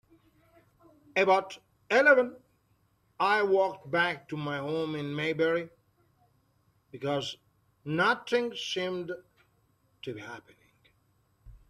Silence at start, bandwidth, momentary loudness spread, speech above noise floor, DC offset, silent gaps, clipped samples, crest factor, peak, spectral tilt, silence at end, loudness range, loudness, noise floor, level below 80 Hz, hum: 1.15 s; 13 kHz; 20 LU; 42 dB; under 0.1%; none; under 0.1%; 24 dB; -8 dBFS; -5 dB/octave; 0.15 s; 7 LU; -28 LUFS; -70 dBFS; -68 dBFS; none